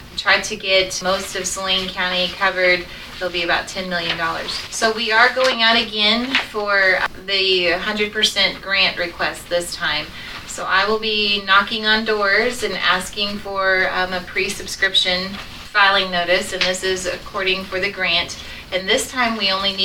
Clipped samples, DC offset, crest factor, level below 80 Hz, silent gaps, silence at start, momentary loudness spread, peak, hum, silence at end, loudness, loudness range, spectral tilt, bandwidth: under 0.1%; under 0.1%; 18 dB; -44 dBFS; none; 0 s; 9 LU; -2 dBFS; none; 0 s; -18 LUFS; 3 LU; -2 dB/octave; 18.5 kHz